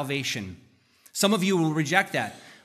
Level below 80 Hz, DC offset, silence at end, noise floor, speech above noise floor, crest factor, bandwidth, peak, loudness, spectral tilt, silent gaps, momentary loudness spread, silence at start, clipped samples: -70 dBFS; under 0.1%; 0.1 s; -59 dBFS; 33 dB; 22 dB; 15 kHz; -4 dBFS; -25 LUFS; -4 dB/octave; none; 13 LU; 0 s; under 0.1%